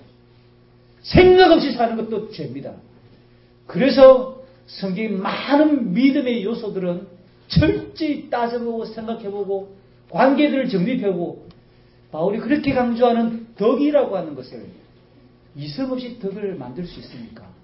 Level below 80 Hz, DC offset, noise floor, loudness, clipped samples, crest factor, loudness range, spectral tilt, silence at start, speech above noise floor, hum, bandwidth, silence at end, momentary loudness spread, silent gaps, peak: -42 dBFS; under 0.1%; -51 dBFS; -19 LUFS; under 0.1%; 20 dB; 7 LU; -10.5 dB/octave; 1.05 s; 33 dB; 60 Hz at -50 dBFS; 5.8 kHz; 0.25 s; 20 LU; none; 0 dBFS